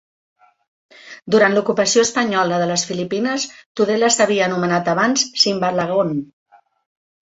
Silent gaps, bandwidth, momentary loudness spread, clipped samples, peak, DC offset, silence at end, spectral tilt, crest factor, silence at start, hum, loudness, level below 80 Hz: 3.66-3.75 s; 8.2 kHz; 7 LU; under 0.1%; -2 dBFS; under 0.1%; 1 s; -3 dB/octave; 18 dB; 1.05 s; none; -17 LUFS; -62 dBFS